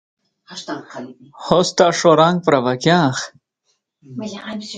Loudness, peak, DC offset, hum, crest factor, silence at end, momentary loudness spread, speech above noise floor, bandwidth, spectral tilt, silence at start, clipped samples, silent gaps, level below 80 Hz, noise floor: -15 LUFS; 0 dBFS; under 0.1%; none; 18 dB; 0 s; 22 LU; 52 dB; 9.4 kHz; -5 dB/octave; 0.5 s; under 0.1%; none; -58 dBFS; -69 dBFS